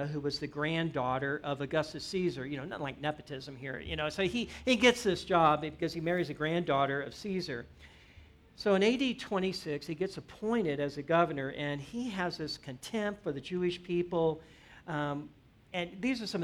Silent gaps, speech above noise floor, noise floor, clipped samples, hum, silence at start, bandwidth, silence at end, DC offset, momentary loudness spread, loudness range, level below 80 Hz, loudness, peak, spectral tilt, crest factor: none; 24 dB; -57 dBFS; under 0.1%; none; 0 s; 15 kHz; 0 s; under 0.1%; 12 LU; 6 LU; -60 dBFS; -33 LUFS; -12 dBFS; -5.5 dB/octave; 20 dB